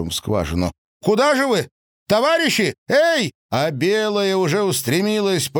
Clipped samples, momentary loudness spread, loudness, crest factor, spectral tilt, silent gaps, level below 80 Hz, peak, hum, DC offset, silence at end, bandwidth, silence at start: under 0.1%; 7 LU; -19 LUFS; 14 dB; -4.5 dB/octave; 0.78-1.00 s, 1.71-2.06 s, 2.78-2.86 s, 3.35-3.49 s; -44 dBFS; -6 dBFS; none; under 0.1%; 0 s; 19.5 kHz; 0 s